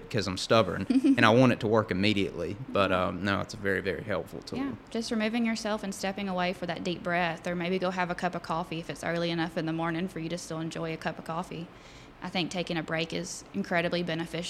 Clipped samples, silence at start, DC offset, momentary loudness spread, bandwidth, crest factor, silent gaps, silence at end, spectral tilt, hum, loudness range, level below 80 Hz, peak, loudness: under 0.1%; 0 s; under 0.1%; 11 LU; 15 kHz; 26 dB; none; 0 s; -5.5 dB/octave; none; 8 LU; -58 dBFS; -4 dBFS; -29 LUFS